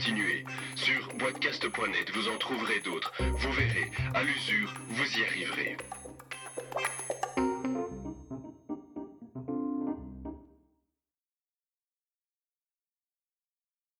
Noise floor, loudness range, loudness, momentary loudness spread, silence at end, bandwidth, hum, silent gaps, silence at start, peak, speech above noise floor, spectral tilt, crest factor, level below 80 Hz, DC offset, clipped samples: under -90 dBFS; 11 LU; -32 LUFS; 15 LU; 3.55 s; 19 kHz; none; none; 0 s; -14 dBFS; over 58 dB; -4 dB/octave; 20 dB; -48 dBFS; under 0.1%; under 0.1%